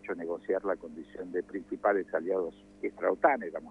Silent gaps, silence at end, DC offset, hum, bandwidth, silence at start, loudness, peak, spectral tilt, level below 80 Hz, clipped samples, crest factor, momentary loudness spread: none; 0 s; under 0.1%; 50 Hz at -60 dBFS; 10 kHz; 0.05 s; -32 LUFS; -10 dBFS; -7.5 dB/octave; -68 dBFS; under 0.1%; 22 dB; 12 LU